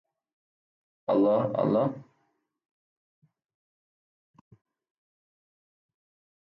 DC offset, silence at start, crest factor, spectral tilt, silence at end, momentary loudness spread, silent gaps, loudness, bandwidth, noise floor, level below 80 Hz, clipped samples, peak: under 0.1%; 1.1 s; 18 dB; -10.5 dB/octave; 4.55 s; 14 LU; none; -26 LUFS; 5.4 kHz; -75 dBFS; -76 dBFS; under 0.1%; -14 dBFS